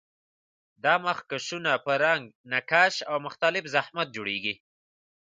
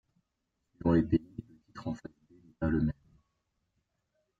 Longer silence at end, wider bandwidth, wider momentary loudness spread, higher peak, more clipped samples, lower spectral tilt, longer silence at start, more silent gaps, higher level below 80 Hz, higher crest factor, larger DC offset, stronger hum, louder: second, 0.7 s vs 1.5 s; first, 9.4 kHz vs 7.6 kHz; second, 10 LU vs 21 LU; first, -6 dBFS vs -14 dBFS; neither; second, -3 dB/octave vs -9.5 dB/octave; about the same, 0.85 s vs 0.85 s; first, 2.35-2.44 s vs none; second, -76 dBFS vs -52 dBFS; about the same, 22 dB vs 20 dB; neither; neither; first, -26 LUFS vs -32 LUFS